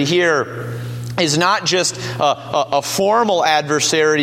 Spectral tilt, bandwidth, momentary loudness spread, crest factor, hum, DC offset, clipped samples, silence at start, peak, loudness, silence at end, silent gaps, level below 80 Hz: -3.5 dB/octave; 16.5 kHz; 10 LU; 16 dB; none; under 0.1%; under 0.1%; 0 s; 0 dBFS; -16 LUFS; 0 s; none; -56 dBFS